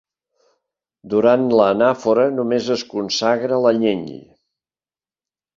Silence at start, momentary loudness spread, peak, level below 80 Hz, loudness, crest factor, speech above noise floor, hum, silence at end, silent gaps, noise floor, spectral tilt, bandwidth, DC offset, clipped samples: 1.05 s; 8 LU; -2 dBFS; -62 dBFS; -17 LUFS; 18 dB; over 73 dB; none; 1.4 s; none; under -90 dBFS; -5 dB/octave; 7.6 kHz; under 0.1%; under 0.1%